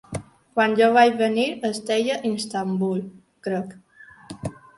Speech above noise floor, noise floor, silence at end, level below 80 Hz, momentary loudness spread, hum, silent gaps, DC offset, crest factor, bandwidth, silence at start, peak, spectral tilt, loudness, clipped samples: 22 dB; -43 dBFS; 0.25 s; -58 dBFS; 19 LU; none; none; under 0.1%; 20 dB; 11.5 kHz; 0.1 s; -4 dBFS; -5 dB/octave; -22 LUFS; under 0.1%